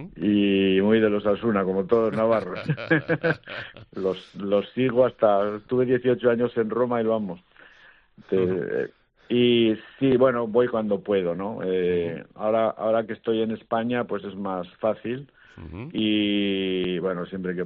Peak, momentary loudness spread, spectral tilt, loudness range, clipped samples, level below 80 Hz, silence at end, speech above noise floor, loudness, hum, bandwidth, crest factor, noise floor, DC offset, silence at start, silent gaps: -6 dBFS; 11 LU; -5 dB/octave; 4 LU; under 0.1%; -60 dBFS; 0 s; 30 dB; -24 LUFS; none; 5.6 kHz; 18 dB; -54 dBFS; under 0.1%; 0 s; none